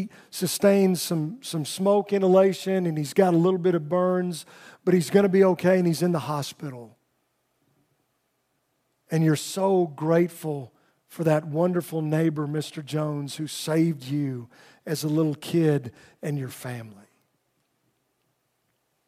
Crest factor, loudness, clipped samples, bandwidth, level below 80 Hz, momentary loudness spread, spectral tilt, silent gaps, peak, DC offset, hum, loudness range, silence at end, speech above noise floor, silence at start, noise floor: 20 dB; -24 LUFS; under 0.1%; 16 kHz; -76 dBFS; 14 LU; -6 dB/octave; none; -6 dBFS; under 0.1%; none; 8 LU; 2.15 s; 50 dB; 0 s; -73 dBFS